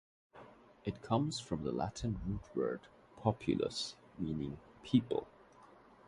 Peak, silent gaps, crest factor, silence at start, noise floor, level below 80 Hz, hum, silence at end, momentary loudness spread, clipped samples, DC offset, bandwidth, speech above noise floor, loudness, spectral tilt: -16 dBFS; none; 24 dB; 0.35 s; -61 dBFS; -58 dBFS; none; 0.45 s; 13 LU; under 0.1%; under 0.1%; 11.5 kHz; 24 dB; -38 LUFS; -6.5 dB/octave